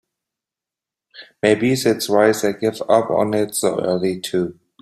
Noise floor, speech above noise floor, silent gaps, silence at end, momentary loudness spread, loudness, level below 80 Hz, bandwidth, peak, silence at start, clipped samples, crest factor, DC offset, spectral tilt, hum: -87 dBFS; 70 dB; none; 0.3 s; 7 LU; -19 LUFS; -60 dBFS; 16 kHz; -2 dBFS; 1.15 s; under 0.1%; 18 dB; under 0.1%; -4.5 dB/octave; none